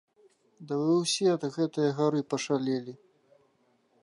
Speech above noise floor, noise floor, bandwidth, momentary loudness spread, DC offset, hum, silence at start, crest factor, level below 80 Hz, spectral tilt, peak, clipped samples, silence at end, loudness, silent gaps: 41 dB; -69 dBFS; 11.5 kHz; 8 LU; under 0.1%; none; 0.6 s; 16 dB; -84 dBFS; -5 dB/octave; -14 dBFS; under 0.1%; 1.1 s; -28 LUFS; none